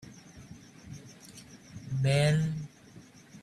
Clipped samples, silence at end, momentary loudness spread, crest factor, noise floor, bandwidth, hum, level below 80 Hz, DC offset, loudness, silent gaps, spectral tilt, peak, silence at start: under 0.1%; 0.05 s; 27 LU; 18 dB; -54 dBFS; 12.5 kHz; none; -60 dBFS; under 0.1%; -29 LUFS; none; -6 dB/octave; -14 dBFS; 0.05 s